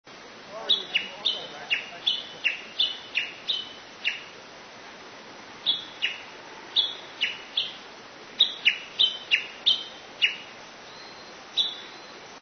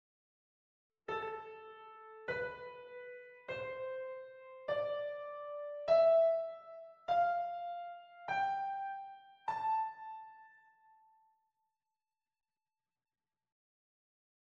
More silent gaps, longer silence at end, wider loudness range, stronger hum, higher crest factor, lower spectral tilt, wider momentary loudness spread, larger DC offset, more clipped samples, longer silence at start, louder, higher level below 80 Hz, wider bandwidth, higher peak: neither; second, 0 s vs 4.05 s; second, 6 LU vs 11 LU; neither; about the same, 22 dB vs 20 dB; second, -0.5 dB/octave vs -5 dB/octave; about the same, 20 LU vs 20 LU; neither; neither; second, 0.05 s vs 1.1 s; first, -26 LUFS vs -37 LUFS; first, -72 dBFS vs -80 dBFS; about the same, 6.6 kHz vs 6.8 kHz; first, -8 dBFS vs -20 dBFS